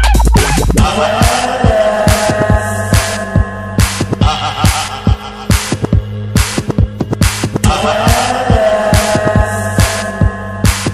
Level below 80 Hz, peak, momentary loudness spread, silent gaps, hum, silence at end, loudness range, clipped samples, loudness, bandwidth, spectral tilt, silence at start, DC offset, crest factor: -18 dBFS; 0 dBFS; 5 LU; none; none; 0 s; 3 LU; under 0.1%; -13 LUFS; 15 kHz; -5 dB/octave; 0 s; 0.3%; 12 dB